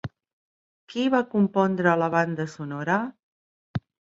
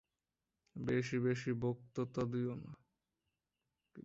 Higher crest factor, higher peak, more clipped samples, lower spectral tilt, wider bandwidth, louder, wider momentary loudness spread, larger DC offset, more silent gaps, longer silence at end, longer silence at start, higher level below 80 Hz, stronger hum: about the same, 22 dB vs 18 dB; first, -4 dBFS vs -24 dBFS; neither; about the same, -7 dB/octave vs -7 dB/octave; about the same, 7.8 kHz vs 7.6 kHz; first, -25 LUFS vs -39 LUFS; about the same, 14 LU vs 12 LU; neither; first, 0.33-0.88 s, 3.23-3.74 s vs none; first, 0.35 s vs 0.05 s; second, 0.05 s vs 0.75 s; first, -60 dBFS vs -70 dBFS; neither